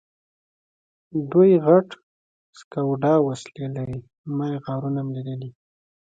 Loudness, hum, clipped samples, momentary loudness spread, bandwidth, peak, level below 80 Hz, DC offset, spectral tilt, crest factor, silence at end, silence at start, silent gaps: -22 LUFS; none; under 0.1%; 17 LU; 9 kHz; -4 dBFS; -60 dBFS; under 0.1%; -8.5 dB/octave; 20 dB; 0.65 s; 1.15 s; 2.03-2.53 s, 2.64-2.71 s, 4.18-4.24 s